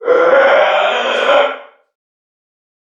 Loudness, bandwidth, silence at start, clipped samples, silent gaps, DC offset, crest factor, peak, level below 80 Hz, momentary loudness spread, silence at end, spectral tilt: -11 LUFS; 7.6 kHz; 0 s; under 0.1%; none; under 0.1%; 14 dB; 0 dBFS; -68 dBFS; 7 LU; 1.2 s; -2 dB/octave